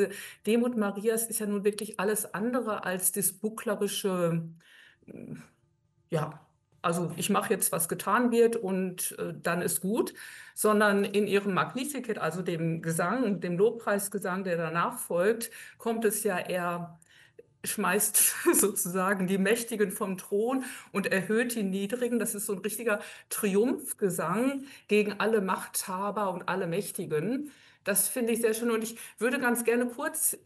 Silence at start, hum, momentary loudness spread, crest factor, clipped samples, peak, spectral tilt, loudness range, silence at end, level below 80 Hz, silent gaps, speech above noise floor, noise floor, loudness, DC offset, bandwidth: 0 s; none; 9 LU; 20 dB; under 0.1%; -10 dBFS; -4 dB/octave; 4 LU; 0.1 s; -76 dBFS; none; 41 dB; -70 dBFS; -29 LUFS; under 0.1%; 13 kHz